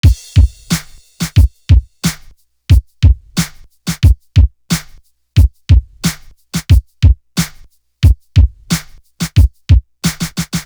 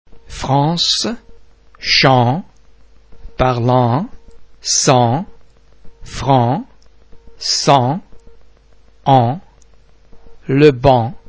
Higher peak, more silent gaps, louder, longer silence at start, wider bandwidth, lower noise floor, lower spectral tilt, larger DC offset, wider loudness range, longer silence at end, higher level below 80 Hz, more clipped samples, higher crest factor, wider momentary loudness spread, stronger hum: about the same, 0 dBFS vs 0 dBFS; neither; about the same, -14 LUFS vs -14 LUFS; about the same, 0.05 s vs 0.15 s; first, over 20 kHz vs 8 kHz; second, -41 dBFS vs -48 dBFS; about the same, -5 dB/octave vs -4.5 dB/octave; second, under 0.1% vs 0.4%; about the same, 1 LU vs 2 LU; about the same, 0.05 s vs 0.1 s; first, -16 dBFS vs -40 dBFS; second, under 0.1% vs 0.1%; about the same, 12 dB vs 16 dB; second, 11 LU vs 17 LU; neither